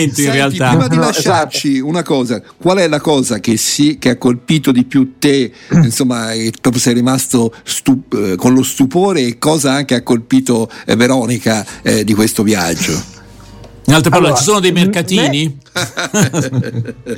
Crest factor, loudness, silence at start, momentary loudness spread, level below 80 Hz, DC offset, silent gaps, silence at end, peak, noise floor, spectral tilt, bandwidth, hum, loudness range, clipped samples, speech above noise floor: 12 dB; -13 LUFS; 0 s; 6 LU; -44 dBFS; under 0.1%; none; 0 s; 0 dBFS; -35 dBFS; -4.5 dB/octave; 17 kHz; none; 1 LU; under 0.1%; 23 dB